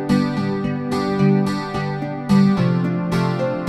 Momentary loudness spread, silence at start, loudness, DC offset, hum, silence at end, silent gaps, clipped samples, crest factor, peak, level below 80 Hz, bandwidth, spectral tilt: 8 LU; 0 s; -19 LUFS; under 0.1%; none; 0 s; none; under 0.1%; 14 dB; -4 dBFS; -48 dBFS; 12 kHz; -7.5 dB/octave